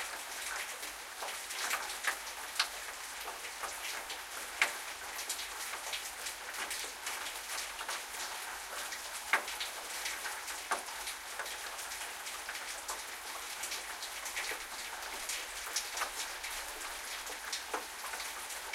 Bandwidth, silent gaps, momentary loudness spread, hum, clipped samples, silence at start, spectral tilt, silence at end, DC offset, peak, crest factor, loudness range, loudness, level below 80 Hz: 16.5 kHz; none; 6 LU; none; under 0.1%; 0 s; 1.5 dB/octave; 0 s; under 0.1%; -12 dBFS; 28 dB; 2 LU; -38 LUFS; -66 dBFS